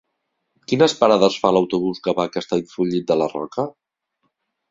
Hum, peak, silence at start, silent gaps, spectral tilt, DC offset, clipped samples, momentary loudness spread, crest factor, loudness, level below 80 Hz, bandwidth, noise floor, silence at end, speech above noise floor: none; -2 dBFS; 0.7 s; none; -5.5 dB/octave; under 0.1%; under 0.1%; 10 LU; 18 dB; -20 LUFS; -60 dBFS; 7.8 kHz; -75 dBFS; 1 s; 56 dB